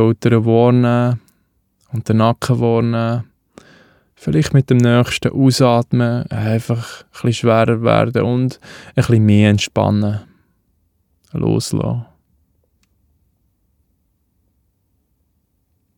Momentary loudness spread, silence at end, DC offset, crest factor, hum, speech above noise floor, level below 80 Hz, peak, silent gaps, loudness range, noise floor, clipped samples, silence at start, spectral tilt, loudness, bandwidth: 12 LU; 3.95 s; under 0.1%; 16 dB; none; 50 dB; -48 dBFS; 0 dBFS; none; 9 LU; -65 dBFS; under 0.1%; 0 s; -7 dB/octave; -16 LUFS; 15 kHz